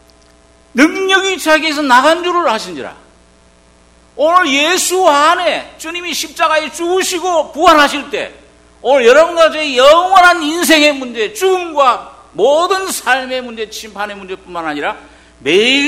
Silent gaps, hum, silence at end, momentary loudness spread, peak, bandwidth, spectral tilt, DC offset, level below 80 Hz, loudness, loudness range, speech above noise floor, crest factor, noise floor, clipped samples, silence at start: none; none; 0 s; 15 LU; 0 dBFS; 18.5 kHz; -1.5 dB/octave; under 0.1%; -48 dBFS; -11 LUFS; 6 LU; 35 dB; 12 dB; -47 dBFS; 0.9%; 0.75 s